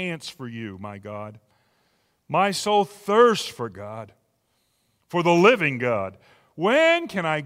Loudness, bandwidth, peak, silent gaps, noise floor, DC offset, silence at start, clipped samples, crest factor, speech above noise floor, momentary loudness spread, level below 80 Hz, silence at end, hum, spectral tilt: -21 LUFS; 16 kHz; -4 dBFS; none; -70 dBFS; under 0.1%; 0 s; under 0.1%; 20 dB; 47 dB; 19 LU; -68 dBFS; 0 s; none; -5 dB/octave